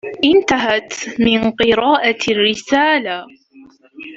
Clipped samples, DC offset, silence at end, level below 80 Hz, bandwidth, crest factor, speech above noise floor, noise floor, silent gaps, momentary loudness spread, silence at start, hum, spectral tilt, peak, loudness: under 0.1%; under 0.1%; 0 s; -48 dBFS; 7.8 kHz; 16 dB; 30 dB; -45 dBFS; none; 11 LU; 0.05 s; none; -3.5 dB/octave; 0 dBFS; -15 LUFS